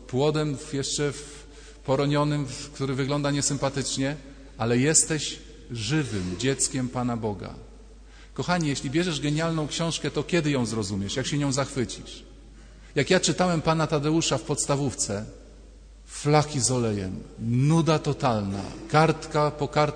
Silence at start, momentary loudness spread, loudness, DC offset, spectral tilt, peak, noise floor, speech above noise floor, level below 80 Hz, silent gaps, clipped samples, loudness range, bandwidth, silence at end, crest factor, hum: 0 s; 12 LU; -25 LUFS; under 0.1%; -4.5 dB/octave; -6 dBFS; -47 dBFS; 22 dB; -48 dBFS; none; under 0.1%; 3 LU; 9.6 kHz; 0 s; 20 dB; none